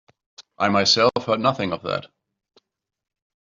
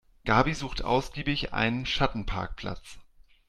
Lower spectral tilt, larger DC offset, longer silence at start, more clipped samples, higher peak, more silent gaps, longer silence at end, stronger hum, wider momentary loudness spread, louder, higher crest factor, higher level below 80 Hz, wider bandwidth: second, -4 dB/octave vs -5.5 dB/octave; neither; first, 0.4 s vs 0.25 s; neither; first, -4 dBFS vs -8 dBFS; neither; first, 1.4 s vs 0.45 s; neither; about the same, 11 LU vs 12 LU; first, -20 LUFS vs -28 LUFS; about the same, 20 dB vs 22 dB; second, -64 dBFS vs -40 dBFS; second, 7.6 kHz vs 13 kHz